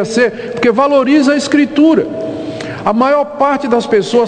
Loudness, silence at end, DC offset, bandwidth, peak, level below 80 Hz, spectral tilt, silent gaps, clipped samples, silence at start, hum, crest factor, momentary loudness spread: -12 LUFS; 0 s; under 0.1%; 9.4 kHz; 0 dBFS; -52 dBFS; -5 dB/octave; none; under 0.1%; 0 s; none; 12 dB; 10 LU